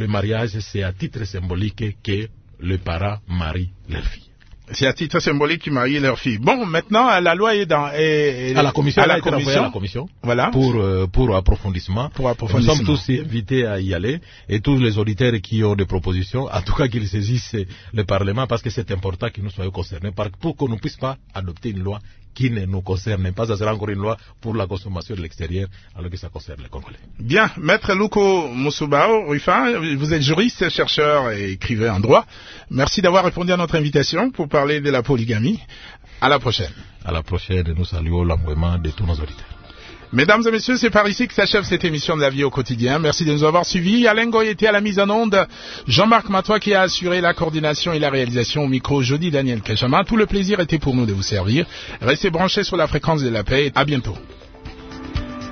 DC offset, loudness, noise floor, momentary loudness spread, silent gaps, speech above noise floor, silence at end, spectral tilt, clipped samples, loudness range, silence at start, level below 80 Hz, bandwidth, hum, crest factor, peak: under 0.1%; -19 LUFS; -40 dBFS; 13 LU; none; 21 dB; 0 s; -5.5 dB/octave; under 0.1%; 8 LU; 0 s; -36 dBFS; 6.6 kHz; none; 18 dB; 0 dBFS